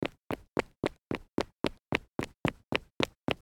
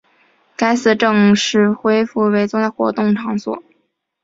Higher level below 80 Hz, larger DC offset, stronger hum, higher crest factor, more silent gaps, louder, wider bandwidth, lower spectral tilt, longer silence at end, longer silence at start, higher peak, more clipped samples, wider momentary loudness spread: about the same, -54 dBFS vs -58 dBFS; neither; neither; first, 28 dB vs 14 dB; first, 0.48-0.52 s, 2.40-2.44 s, 2.91-2.96 s, 3.17-3.21 s vs none; second, -35 LUFS vs -15 LUFS; first, 18 kHz vs 7.8 kHz; about the same, -5.5 dB/octave vs -5 dB/octave; second, 0.05 s vs 0.65 s; second, 0 s vs 0.6 s; second, -8 dBFS vs -2 dBFS; neither; second, 5 LU vs 10 LU